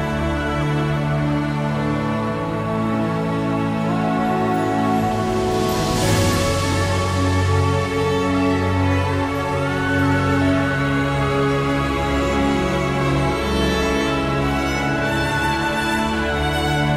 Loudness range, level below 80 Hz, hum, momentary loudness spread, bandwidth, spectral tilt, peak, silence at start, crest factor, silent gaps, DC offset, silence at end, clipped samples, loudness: 2 LU; -32 dBFS; none; 3 LU; 16 kHz; -5.5 dB/octave; -6 dBFS; 0 s; 12 dB; none; under 0.1%; 0 s; under 0.1%; -20 LUFS